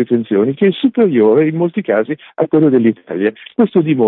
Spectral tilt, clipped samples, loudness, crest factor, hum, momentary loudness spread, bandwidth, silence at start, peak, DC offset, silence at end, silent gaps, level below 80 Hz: -13 dB/octave; under 0.1%; -14 LUFS; 12 dB; none; 7 LU; 4.1 kHz; 0 s; -2 dBFS; under 0.1%; 0 s; none; -62 dBFS